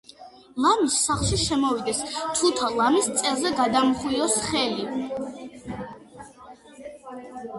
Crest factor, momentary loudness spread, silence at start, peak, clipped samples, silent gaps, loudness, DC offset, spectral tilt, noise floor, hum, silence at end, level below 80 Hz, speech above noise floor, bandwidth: 18 dB; 19 LU; 0.2 s; -8 dBFS; under 0.1%; none; -23 LUFS; under 0.1%; -3 dB/octave; -47 dBFS; none; 0 s; -48 dBFS; 24 dB; 12 kHz